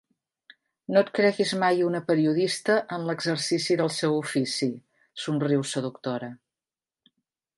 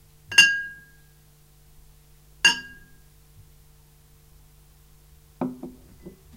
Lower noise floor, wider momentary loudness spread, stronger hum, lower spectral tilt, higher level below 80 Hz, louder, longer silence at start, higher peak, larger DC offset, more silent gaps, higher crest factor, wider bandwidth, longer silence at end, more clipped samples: first, under -90 dBFS vs -55 dBFS; second, 10 LU vs 27 LU; neither; first, -5 dB/octave vs 0 dB/octave; second, -76 dBFS vs -56 dBFS; second, -25 LUFS vs -20 LUFS; first, 0.9 s vs 0.3 s; second, -8 dBFS vs 0 dBFS; neither; neither; second, 18 dB vs 28 dB; second, 11.5 kHz vs 16 kHz; first, 1.2 s vs 0.25 s; neither